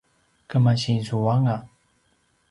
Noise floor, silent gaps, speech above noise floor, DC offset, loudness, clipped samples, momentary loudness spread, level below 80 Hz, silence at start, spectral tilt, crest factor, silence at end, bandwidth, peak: -66 dBFS; none; 45 dB; under 0.1%; -23 LUFS; under 0.1%; 6 LU; -58 dBFS; 0.5 s; -7 dB/octave; 16 dB; 0.85 s; 11 kHz; -8 dBFS